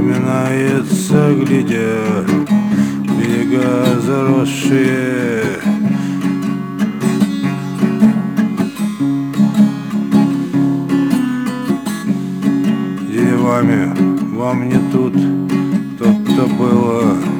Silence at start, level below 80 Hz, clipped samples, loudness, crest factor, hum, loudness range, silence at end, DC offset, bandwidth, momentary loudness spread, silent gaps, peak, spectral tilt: 0 s; -52 dBFS; under 0.1%; -15 LUFS; 14 dB; none; 2 LU; 0 s; under 0.1%; 18 kHz; 6 LU; none; 0 dBFS; -7 dB/octave